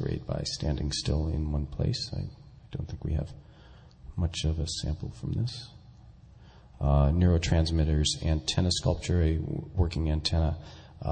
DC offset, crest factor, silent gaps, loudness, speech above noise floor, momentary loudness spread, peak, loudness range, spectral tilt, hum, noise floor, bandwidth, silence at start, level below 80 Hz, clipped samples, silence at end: under 0.1%; 16 dB; none; -29 LUFS; 24 dB; 13 LU; -12 dBFS; 8 LU; -5.5 dB/octave; none; -52 dBFS; 9.4 kHz; 0 s; -34 dBFS; under 0.1%; 0 s